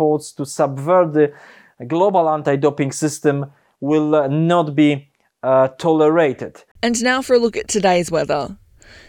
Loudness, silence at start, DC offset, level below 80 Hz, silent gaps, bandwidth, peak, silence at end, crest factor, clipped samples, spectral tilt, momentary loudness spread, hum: -17 LUFS; 0 s; under 0.1%; -56 dBFS; 6.71-6.75 s; 17 kHz; -2 dBFS; 0.55 s; 14 dB; under 0.1%; -5.5 dB/octave; 11 LU; none